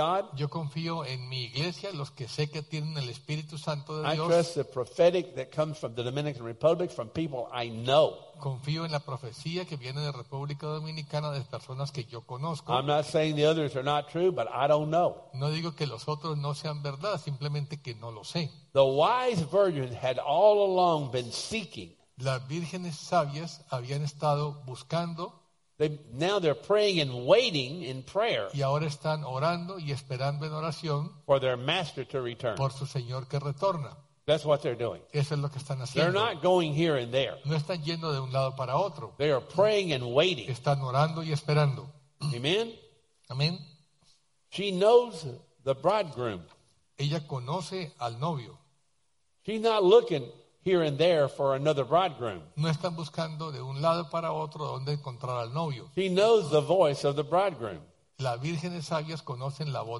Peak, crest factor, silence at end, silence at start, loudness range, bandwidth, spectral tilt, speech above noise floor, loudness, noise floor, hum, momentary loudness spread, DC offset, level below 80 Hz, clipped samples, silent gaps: -8 dBFS; 20 dB; 0 s; 0 s; 6 LU; 11.5 kHz; -6 dB/octave; 48 dB; -29 LUFS; -77 dBFS; none; 12 LU; under 0.1%; -66 dBFS; under 0.1%; none